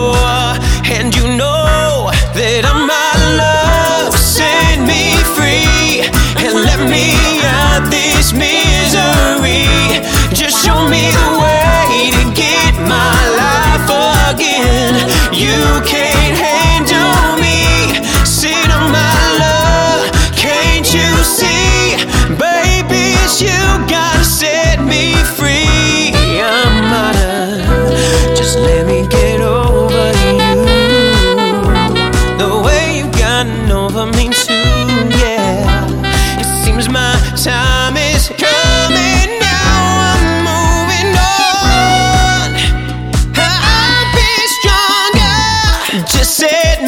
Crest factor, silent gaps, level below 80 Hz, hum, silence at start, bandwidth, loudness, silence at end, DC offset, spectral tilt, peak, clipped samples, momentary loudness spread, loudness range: 10 dB; none; -16 dBFS; none; 0 s; over 20 kHz; -10 LUFS; 0 s; 0.1%; -3.5 dB/octave; 0 dBFS; under 0.1%; 3 LU; 2 LU